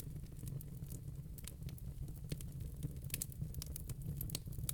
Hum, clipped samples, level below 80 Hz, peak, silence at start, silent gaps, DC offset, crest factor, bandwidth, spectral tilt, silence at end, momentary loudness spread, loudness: none; under 0.1%; -50 dBFS; -20 dBFS; 0 s; none; under 0.1%; 26 dB; 19.5 kHz; -4.5 dB/octave; 0 s; 6 LU; -47 LUFS